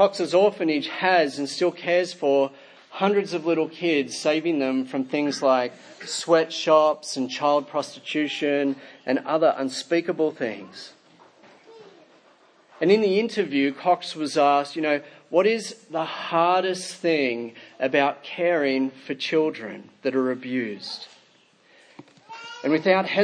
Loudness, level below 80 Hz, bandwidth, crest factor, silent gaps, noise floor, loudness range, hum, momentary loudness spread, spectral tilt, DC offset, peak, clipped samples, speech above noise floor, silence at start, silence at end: -23 LUFS; -82 dBFS; 10.5 kHz; 18 dB; none; -59 dBFS; 5 LU; none; 11 LU; -4.5 dB/octave; under 0.1%; -6 dBFS; under 0.1%; 36 dB; 0 s; 0 s